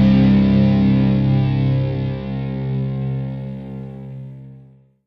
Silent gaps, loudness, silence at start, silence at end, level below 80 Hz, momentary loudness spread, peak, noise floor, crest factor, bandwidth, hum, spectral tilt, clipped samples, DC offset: none; -18 LUFS; 0 s; 0.45 s; -36 dBFS; 19 LU; -4 dBFS; -46 dBFS; 14 dB; 5.6 kHz; none; -10.5 dB/octave; under 0.1%; under 0.1%